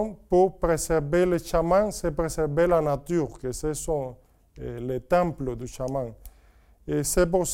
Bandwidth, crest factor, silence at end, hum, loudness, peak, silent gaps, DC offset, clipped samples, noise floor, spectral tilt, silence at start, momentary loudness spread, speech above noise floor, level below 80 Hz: 17 kHz; 16 dB; 0 s; none; -25 LUFS; -8 dBFS; none; under 0.1%; under 0.1%; -56 dBFS; -5.5 dB/octave; 0 s; 11 LU; 31 dB; -40 dBFS